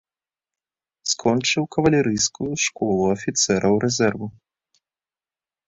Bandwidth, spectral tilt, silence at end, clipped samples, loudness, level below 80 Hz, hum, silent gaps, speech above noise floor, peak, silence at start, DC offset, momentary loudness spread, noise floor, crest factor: 8.4 kHz; -4 dB/octave; 1.35 s; under 0.1%; -21 LUFS; -54 dBFS; none; none; over 69 dB; -4 dBFS; 1.05 s; under 0.1%; 5 LU; under -90 dBFS; 20 dB